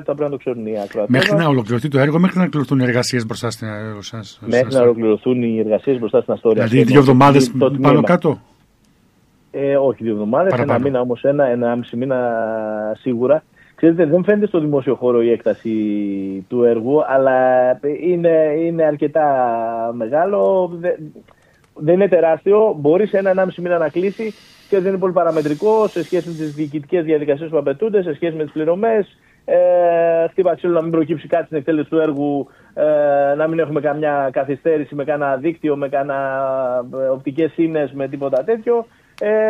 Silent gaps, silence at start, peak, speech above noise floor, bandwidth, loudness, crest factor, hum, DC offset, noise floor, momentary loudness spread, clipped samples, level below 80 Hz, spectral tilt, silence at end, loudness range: none; 0 s; 0 dBFS; 39 dB; 13.5 kHz; -17 LUFS; 16 dB; none; under 0.1%; -55 dBFS; 9 LU; under 0.1%; -58 dBFS; -7 dB/octave; 0 s; 5 LU